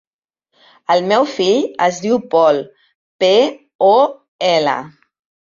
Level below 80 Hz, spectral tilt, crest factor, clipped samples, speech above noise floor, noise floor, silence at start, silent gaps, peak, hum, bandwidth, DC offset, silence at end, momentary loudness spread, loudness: -64 dBFS; -4.5 dB/octave; 14 dB; under 0.1%; 59 dB; -73 dBFS; 0.9 s; 2.95-3.19 s, 3.75-3.79 s, 4.28-4.39 s; -2 dBFS; none; 7.4 kHz; under 0.1%; 0.7 s; 7 LU; -15 LUFS